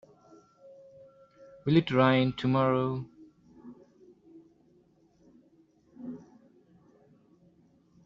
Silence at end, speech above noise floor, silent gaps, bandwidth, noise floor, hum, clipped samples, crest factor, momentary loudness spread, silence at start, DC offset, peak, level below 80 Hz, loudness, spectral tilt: 1.9 s; 39 dB; none; 7.2 kHz; -64 dBFS; none; under 0.1%; 24 dB; 26 LU; 1.65 s; under 0.1%; -8 dBFS; -66 dBFS; -27 LUFS; -5.5 dB/octave